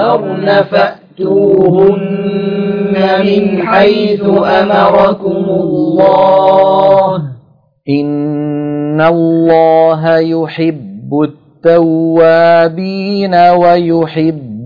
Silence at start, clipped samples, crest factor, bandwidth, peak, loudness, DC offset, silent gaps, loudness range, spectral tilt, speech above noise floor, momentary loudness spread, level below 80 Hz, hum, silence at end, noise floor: 0 s; 0.3%; 10 dB; 5.2 kHz; 0 dBFS; -10 LUFS; under 0.1%; none; 2 LU; -9 dB/octave; 36 dB; 8 LU; -50 dBFS; none; 0 s; -44 dBFS